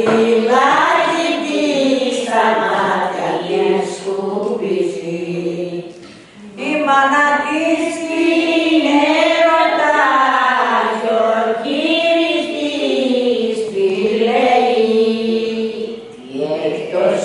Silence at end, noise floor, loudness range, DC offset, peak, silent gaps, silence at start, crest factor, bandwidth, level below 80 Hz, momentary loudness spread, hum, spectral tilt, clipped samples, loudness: 0 s; -38 dBFS; 5 LU; under 0.1%; 0 dBFS; none; 0 s; 16 dB; 11.5 kHz; -62 dBFS; 9 LU; none; -4.5 dB/octave; under 0.1%; -15 LUFS